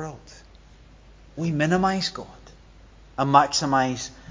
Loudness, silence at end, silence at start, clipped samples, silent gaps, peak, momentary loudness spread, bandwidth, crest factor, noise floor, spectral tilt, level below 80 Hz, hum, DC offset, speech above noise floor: -22 LUFS; 0.15 s; 0 s; under 0.1%; none; -2 dBFS; 22 LU; 7.8 kHz; 24 dB; -50 dBFS; -4.5 dB/octave; -50 dBFS; none; under 0.1%; 27 dB